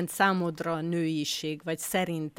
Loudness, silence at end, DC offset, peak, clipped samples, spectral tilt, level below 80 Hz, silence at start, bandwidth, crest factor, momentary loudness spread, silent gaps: -29 LUFS; 0.1 s; under 0.1%; -10 dBFS; under 0.1%; -4.5 dB/octave; -66 dBFS; 0 s; 17 kHz; 20 dB; 7 LU; none